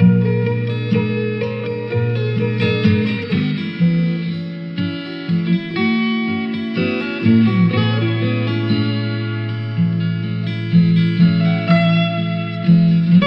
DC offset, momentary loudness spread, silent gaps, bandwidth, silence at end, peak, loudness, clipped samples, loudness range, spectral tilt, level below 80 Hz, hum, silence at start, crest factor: under 0.1%; 9 LU; none; 5.6 kHz; 0 s; -2 dBFS; -17 LUFS; under 0.1%; 3 LU; -9.5 dB/octave; -58 dBFS; none; 0 s; 14 dB